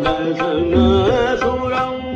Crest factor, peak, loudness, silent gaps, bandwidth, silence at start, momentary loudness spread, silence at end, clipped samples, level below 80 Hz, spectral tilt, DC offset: 12 dB; -4 dBFS; -17 LUFS; none; 7.8 kHz; 0 s; 6 LU; 0 s; under 0.1%; -34 dBFS; -7 dB/octave; under 0.1%